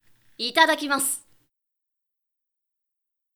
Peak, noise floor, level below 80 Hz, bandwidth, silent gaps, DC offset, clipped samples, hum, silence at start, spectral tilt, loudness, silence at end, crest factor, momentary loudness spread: -2 dBFS; -83 dBFS; -78 dBFS; over 20 kHz; none; under 0.1%; under 0.1%; none; 0.4 s; 0 dB/octave; -22 LUFS; 2.15 s; 26 dB; 11 LU